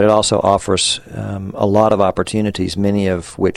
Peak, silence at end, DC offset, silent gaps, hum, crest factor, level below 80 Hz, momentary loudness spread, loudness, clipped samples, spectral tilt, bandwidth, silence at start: 0 dBFS; 0 s; under 0.1%; none; none; 16 dB; -42 dBFS; 8 LU; -16 LUFS; under 0.1%; -4.5 dB/octave; 12.5 kHz; 0 s